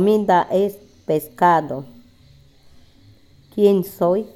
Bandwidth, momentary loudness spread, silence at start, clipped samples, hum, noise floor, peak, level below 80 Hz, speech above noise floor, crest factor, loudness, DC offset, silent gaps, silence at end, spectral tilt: 18 kHz; 14 LU; 0 s; under 0.1%; none; -50 dBFS; -4 dBFS; -58 dBFS; 33 dB; 16 dB; -18 LUFS; under 0.1%; none; 0.1 s; -7 dB/octave